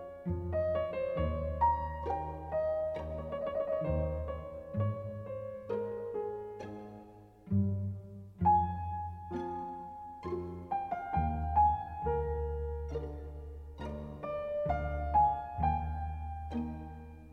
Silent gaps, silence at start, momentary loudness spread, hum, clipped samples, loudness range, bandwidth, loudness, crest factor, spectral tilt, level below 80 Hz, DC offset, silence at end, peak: none; 0 s; 15 LU; none; under 0.1%; 4 LU; 6 kHz; -35 LUFS; 18 dB; -10 dB/octave; -44 dBFS; under 0.1%; 0 s; -18 dBFS